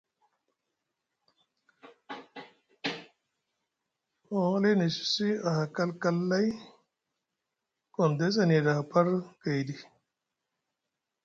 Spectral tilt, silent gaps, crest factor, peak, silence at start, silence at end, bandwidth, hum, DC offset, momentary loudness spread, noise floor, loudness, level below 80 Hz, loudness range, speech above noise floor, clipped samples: -6 dB/octave; none; 20 dB; -12 dBFS; 2.1 s; 1.4 s; 7.6 kHz; none; under 0.1%; 19 LU; -86 dBFS; -29 LUFS; -74 dBFS; 15 LU; 59 dB; under 0.1%